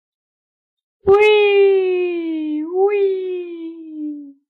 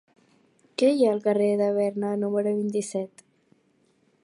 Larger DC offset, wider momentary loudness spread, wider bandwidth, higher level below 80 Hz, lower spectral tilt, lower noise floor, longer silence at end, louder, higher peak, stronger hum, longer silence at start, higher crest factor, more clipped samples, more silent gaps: neither; first, 18 LU vs 11 LU; second, 5.8 kHz vs 11.5 kHz; first, -56 dBFS vs -76 dBFS; about the same, -6 dB/octave vs -6 dB/octave; first, under -90 dBFS vs -66 dBFS; second, 0.2 s vs 1.15 s; first, -16 LUFS vs -25 LUFS; first, -4 dBFS vs -10 dBFS; neither; first, 1.05 s vs 0.8 s; about the same, 14 dB vs 16 dB; neither; neither